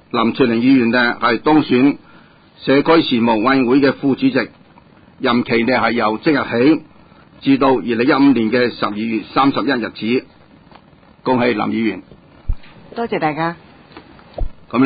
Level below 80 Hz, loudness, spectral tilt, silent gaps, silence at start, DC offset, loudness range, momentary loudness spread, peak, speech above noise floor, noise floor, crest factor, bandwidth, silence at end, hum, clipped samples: -38 dBFS; -16 LUFS; -11 dB/octave; none; 0.15 s; under 0.1%; 7 LU; 17 LU; -2 dBFS; 31 dB; -46 dBFS; 14 dB; 5 kHz; 0 s; none; under 0.1%